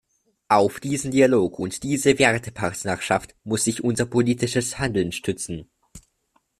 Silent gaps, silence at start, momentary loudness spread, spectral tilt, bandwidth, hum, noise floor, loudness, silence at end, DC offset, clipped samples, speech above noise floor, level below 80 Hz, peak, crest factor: none; 0.5 s; 10 LU; -4.5 dB/octave; 14 kHz; none; -68 dBFS; -22 LUFS; 0.6 s; under 0.1%; under 0.1%; 46 dB; -52 dBFS; -2 dBFS; 20 dB